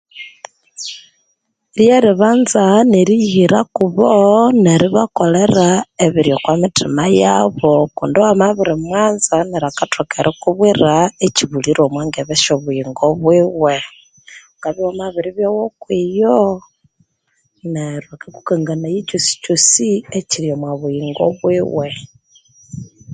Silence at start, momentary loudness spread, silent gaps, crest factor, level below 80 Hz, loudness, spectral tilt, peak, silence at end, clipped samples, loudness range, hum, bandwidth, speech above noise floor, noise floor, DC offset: 0.15 s; 15 LU; none; 14 dB; -50 dBFS; -14 LUFS; -4.5 dB/octave; 0 dBFS; 0 s; under 0.1%; 7 LU; none; 9.6 kHz; 53 dB; -66 dBFS; under 0.1%